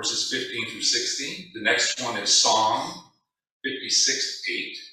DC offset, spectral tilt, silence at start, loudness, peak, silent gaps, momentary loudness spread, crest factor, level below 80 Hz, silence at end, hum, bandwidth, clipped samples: under 0.1%; 0 dB/octave; 0 s; -22 LUFS; -6 dBFS; 3.51-3.60 s; 14 LU; 18 dB; -72 dBFS; 0 s; none; 15.5 kHz; under 0.1%